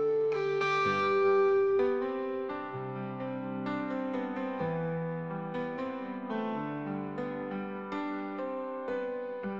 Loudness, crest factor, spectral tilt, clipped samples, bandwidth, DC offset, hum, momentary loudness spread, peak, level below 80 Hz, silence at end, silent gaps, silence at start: -32 LUFS; 14 dB; -7 dB/octave; under 0.1%; 7 kHz; under 0.1%; none; 11 LU; -18 dBFS; -76 dBFS; 0 s; none; 0 s